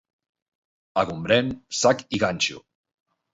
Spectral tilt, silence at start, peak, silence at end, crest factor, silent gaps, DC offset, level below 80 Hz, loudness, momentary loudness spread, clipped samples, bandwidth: -3.5 dB/octave; 0.95 s; -4 dBFS; 0.75 s; 22 dB; none; under 0.1%; -56 dBFS; -23 LUFS; 5 LU; under 0.1%; 8 kHz